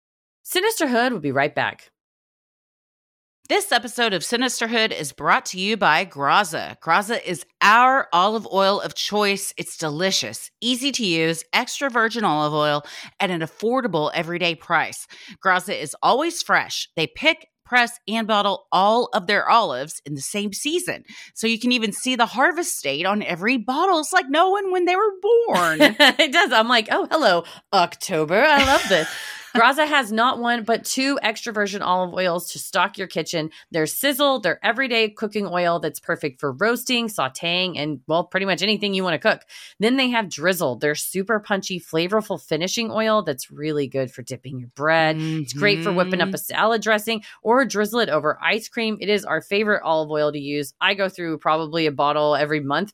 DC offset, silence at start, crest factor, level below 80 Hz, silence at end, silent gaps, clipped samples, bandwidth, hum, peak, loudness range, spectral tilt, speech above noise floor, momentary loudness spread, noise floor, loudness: under 0.1%; 0.45 s; 20 dB; -60 dBFS; 0.05 s; 2.01-3.43 s; under 0.1%; 17.5 kHz; none; -2 dBFS; 6 LU; -3.5 dB/octave; over 69 dB; 9 LU; under -90 dBFS; -20 LUFS